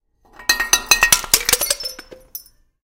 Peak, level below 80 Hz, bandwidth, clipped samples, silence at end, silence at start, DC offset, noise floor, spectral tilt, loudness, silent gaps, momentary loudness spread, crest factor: 0 dBFS; -40 dBFS; over 20 kHz; under 0.1%; 0.4 s; 0.4 s; under 0.1%; -39 dBFS; 1.5 dB/octave; -15 LUFS; none; 22 LU; 20 dB